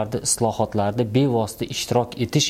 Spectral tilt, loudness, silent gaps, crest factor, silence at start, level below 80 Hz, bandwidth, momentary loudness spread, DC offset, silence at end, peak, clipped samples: -4.5 dB/octave; -22 LUFS; none; 16 dB; 0 s; -50 dBFS; 16 kHz; 4 LU; under 0.1%; 0 s; -6 dBFS; under 0.1%